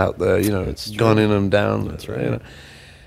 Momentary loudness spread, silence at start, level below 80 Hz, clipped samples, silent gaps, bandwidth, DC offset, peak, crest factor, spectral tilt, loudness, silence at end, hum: 11 LU; 0 s; -40 dBFS; under 0.1%; none; 16 kHz; under 0.1%; 0 dBFS; 20 dB; -6.5 dB/octave; -20 LUFS; 0.15 s; none